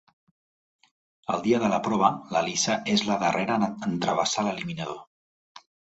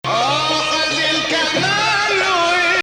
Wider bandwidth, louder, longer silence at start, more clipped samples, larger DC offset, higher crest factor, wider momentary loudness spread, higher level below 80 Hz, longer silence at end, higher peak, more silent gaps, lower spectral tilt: second, 8.2 kHz vs over 20 kHz; second, -26 LUFS vs -15 LUFS; first, 1.3 s vs 0.05 s; neither; neither; first, 22 dB vs 10 dB; first, 10 LU vs 2 LU; second, -64 dBFS vs -50 dBFS; first, 0.4 s vs 0 s; about the same, -6 dBFS vs -6 dBFS; first, 5.07-5.55 s vs none; first, -4 dB/octave vs -2 dB/octave